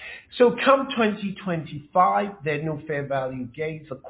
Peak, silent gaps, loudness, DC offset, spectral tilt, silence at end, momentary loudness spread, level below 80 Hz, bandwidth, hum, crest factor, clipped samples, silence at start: -4 dBFS; none; -24 LUFS; under 0.1%; -10 dB/octave; 0 s; 12 LU; -60 dBFS; 4 kHz; none; 20 dB; under 0.1%; 0 s